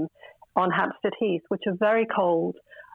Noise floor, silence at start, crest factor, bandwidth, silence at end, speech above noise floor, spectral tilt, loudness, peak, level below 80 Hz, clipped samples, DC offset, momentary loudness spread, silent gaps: -50 dBFS; 0 s; 18 dB; 4.5 kHz; 0.1 s; 25 dB; -8.5 dB/octave; -25 LUFS; -8 dBFS; -70 dBFS; under 0.1%; under 0.1%; 9 LU; none